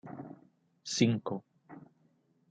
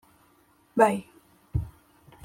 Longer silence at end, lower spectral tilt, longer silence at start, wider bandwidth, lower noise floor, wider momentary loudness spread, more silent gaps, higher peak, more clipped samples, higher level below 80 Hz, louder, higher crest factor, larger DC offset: first, 0.7 s vs 0.55 s; second, -5 dB/octave vs -7 dB/octave; second, 0.05 s vs 0.75 s; second, 9.4 kHz vs 16.5 kHz; first, -71 dBFS vs -62 dBFS; first, 25 LU vs 12 LU; neither; second, -12 dBFS vs -6 dBFS; neither; second, -78 dBFS vs -46 dBFS; second, -32 LUFS vs -27 LUFS; about the same, 24 dB vs 24 dB; neither